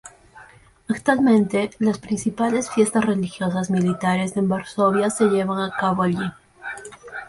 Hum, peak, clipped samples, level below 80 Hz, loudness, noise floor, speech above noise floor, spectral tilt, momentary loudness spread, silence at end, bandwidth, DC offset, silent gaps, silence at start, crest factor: none; -6 dBFS; under 0.1%; -56 dBFS; -21 LUFS; -49 dBFS; 29 dB; -6 dB/octave; 12 LU; 0 s; 11.5 kHz; under 0.1%; none; 0.05 s; 16 dB